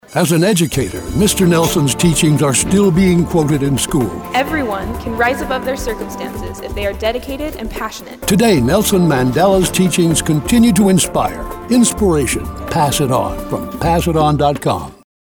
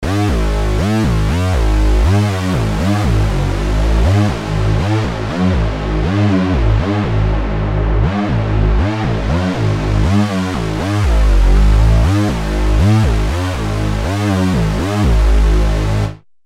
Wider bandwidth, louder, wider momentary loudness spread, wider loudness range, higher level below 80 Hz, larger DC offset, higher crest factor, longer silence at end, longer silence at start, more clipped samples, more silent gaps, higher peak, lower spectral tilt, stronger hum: first, over 20 kHz vs 12.5 kHz; about the same, -14 LUFS vs -15 LUFS; first, 11 LU vs 5 LU; first, 6 LU vs 2 LU; second, -30 dBFS vs -16 dBFS; neither; about the same, 14 dB vs 12 dB; about the same, 0.3 s vs 0.3 s; about the same, 0.1 s vs 0 s; neither; neither; about the same, 0 dBFS vs -2 dBFS; second, -5 dB/octave vs -7 dB/octave; neither